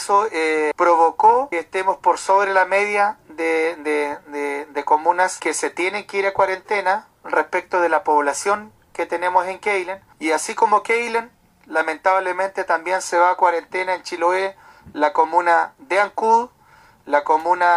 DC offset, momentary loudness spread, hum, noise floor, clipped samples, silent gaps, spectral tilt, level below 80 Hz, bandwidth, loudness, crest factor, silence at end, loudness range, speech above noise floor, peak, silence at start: under 0.1%; 9 LU; none; -51 dBFS; under 0.1%; none; -2.5 dB/octave; -64 dBFS; 13 kHz; -19 LUFS; 16 dB; 0 s; 3 LU; 32 dB; -2 dBFS; 0 s